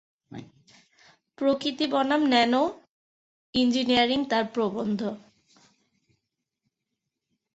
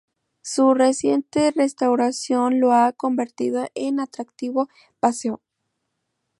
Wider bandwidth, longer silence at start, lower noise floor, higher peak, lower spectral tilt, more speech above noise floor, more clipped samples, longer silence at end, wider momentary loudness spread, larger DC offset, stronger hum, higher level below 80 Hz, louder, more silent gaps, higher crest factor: second, 8 kHz vs 11.5 kHz; second, 0.3 s vs 0.45 s; first, -84 dBFS vs -77 dBFS; second, -8 dBFS vs -2 dBFS; about the same, -4.5 dB/octave vs -4 dB/octave; about the same, 59 dB vs 56 dB; neither; first, 2.35 s vs 1.05 s; first, 22 LU vs 12 LU; neither; neither; about the same, -64 dBFS vs -66 dBFS; second, -25 LUFS vs -21 LUFS; first, 2.89-3.53 s vs none; about the same, 20 dB vs 18 dB